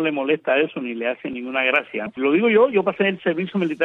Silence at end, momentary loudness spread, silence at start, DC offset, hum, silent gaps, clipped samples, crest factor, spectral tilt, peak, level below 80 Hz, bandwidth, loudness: 0 s; 9 LU; 0 s; under 0.1%; none; none; under 0.1%; 16 dB; -7.5 dB/octave; -4 dBFS; -68 dBFS; 4.1 kHz; -20 LUFS